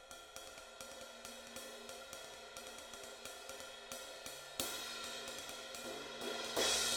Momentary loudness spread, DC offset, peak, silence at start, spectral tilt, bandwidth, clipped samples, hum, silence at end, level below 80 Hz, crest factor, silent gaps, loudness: 10 LU; under 0.1%; -20 dBFS; 0 s; -0.5 dB/octave; over 20 kHz; under 0.1%; none; 0 s; -70 dBFS; 26 dB; none; -44 LUFS